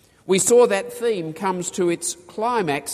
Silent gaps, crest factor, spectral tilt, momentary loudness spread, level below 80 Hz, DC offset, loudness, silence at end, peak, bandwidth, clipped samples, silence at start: none; 16 dB; -3.5 dB/octave; 10 LU; -62 dBFS; under 0.1%; -21 LUFS; 0 s; -4 dBFS; 15.5 kHz; under 0.1%; 0.25 s